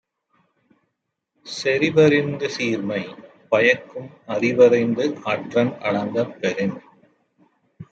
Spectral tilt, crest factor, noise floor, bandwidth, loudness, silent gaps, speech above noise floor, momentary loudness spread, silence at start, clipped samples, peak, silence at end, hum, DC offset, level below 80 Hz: -6 dB/octave; 20 dB; -77 dBFS; 8 kHz; -20 LUFS; none; 57 dB; 13 LU; 1.45 s; under 0.1%; -2 dBFS; 0.1 s; none; under 0.1%; -66 dBFS